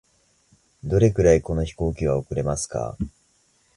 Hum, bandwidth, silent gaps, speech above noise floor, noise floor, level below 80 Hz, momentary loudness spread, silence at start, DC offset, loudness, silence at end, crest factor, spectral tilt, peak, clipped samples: none; 11.5 kHz; none; 42 dB; -63 dBFS; -36 dBFS; 14 LU; 0.85 s; under 0.1%; -23 LUFS; 0.7 s; 20 dB; -6.5 dB/octave; -4 dBFS; under 0.1%